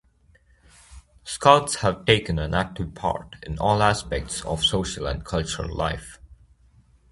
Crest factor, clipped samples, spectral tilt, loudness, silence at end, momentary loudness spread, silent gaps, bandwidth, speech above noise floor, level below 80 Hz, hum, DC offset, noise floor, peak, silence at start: 24 dB; under 0.1%; -4 dB/octave; -23 LUFS; 0.75 s; 14 LU; none; 11.5 kHz; 35 dB; -40 dBFS; none; under 0.1%; -59 dBFS; 0 dBFS; 0.9 s